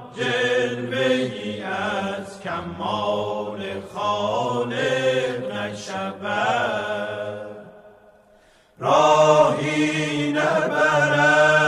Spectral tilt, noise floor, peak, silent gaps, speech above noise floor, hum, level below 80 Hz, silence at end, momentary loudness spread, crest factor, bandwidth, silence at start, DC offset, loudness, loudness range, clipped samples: -4.5 dB/octave; -55 dBFS; -4 dBFS; none; 30 dB; none; -62 dBFS; 0 s; 14 LU; 18 dB; 12.5 kHz; 0 s; under 0.1%; -21 LUFS; 7 LU; under 0.1%